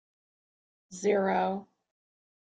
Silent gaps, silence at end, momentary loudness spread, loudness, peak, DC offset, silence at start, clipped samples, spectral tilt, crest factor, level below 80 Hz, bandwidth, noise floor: none; 0.85 s; 14 LU; -29 LUFS; -16 dBFS; under 0.1%; 0.9 s; under 0.1%; -5.5 dB/octave; 18 dB; -76 dBFS; 9.2 kHz; under -90 dBFS